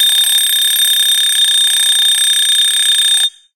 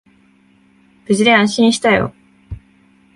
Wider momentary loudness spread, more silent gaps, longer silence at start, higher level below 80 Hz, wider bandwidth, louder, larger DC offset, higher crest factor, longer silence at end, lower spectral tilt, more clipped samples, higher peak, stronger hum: second, 1 LU vs 24 LU; neither; second, 0 s vs 1.1 s; second, -64 dBFS vs -44 dBFS; first, 17.5 kHz vs 11.5 kHz; first, -8 LUFS vs -14 LUFS; first, 0.3% vs under 0.1%; second, 10 dB vs 18 dB; second, 0.25 s vs 0.6 s; second, 6 dB/octave vs -4.5 dB/octave; neither; about the same, -2 dBFS vs 0 dBFS; neither